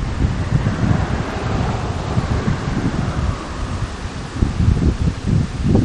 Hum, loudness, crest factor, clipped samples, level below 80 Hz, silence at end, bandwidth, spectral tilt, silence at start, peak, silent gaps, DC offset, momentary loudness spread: none; -20 LUFS; 18 dB; under 0.1%; -24 dBFS; 0 s; 10.5 kHz; -7 dB/octave; 0 s; 0 dBFS; none; under 0.1%; 8 LU